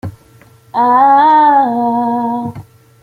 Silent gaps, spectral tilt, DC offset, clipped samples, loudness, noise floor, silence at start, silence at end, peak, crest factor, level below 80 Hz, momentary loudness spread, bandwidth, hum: none; -7.5 dB/octave; under 0.1%; under 0.1%; -11 LUFS; -44 dBFS; 0.05 s; 0.4 s; 0 dBFS; 12 dB; -54 dBFS; 14 LU; 4.8 kHz; none